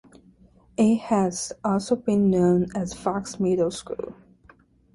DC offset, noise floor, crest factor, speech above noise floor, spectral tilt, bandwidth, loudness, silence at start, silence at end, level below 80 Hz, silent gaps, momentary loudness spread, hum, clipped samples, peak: under 0.1%; -56 dBFS; 16 dB; 33 dB; -6.5 dB/octave; 11.5 kHz; -24 LUFS; 0.8 s; 0.8 s; -54 dBFS; none; 13 LU; none; under 0.1%; -8 dBFS